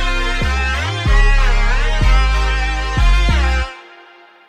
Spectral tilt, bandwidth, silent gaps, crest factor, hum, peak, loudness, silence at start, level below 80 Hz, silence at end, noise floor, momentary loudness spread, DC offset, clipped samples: -4.5 dB/octave; 9.8 kHz; none; 12 dB; none; -2 dBFS; -17 LUFS; 0 s; -14 dBFS; 0.7 s; -43 dBFS; 4 LU; under 0.1%; under 0.1%